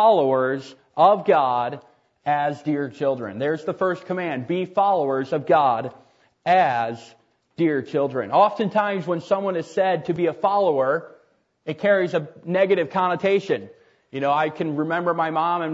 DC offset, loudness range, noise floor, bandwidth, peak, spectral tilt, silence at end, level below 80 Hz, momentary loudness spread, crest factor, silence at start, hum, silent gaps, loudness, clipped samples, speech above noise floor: under 0.1%; 2 LU; -61 dBFS; 8 kHz; -4 dBFS; -7 dB/octave; 0 s; -72 dBFS; 9 LU; 18 dB; 0 s; none; none; -22 LUFS; under 0.1%; 40 dB